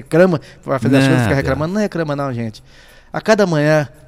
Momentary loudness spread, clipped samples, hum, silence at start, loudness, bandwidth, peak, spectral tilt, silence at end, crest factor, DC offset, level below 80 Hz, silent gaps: 10 LU; under 0.1%; none; 0 s; -16 LUFS; 15 kHz; 0 dBFS; -6.5 dB/octave; 0.2 s; 16 dB; under 0.1%; -42 dBFS; none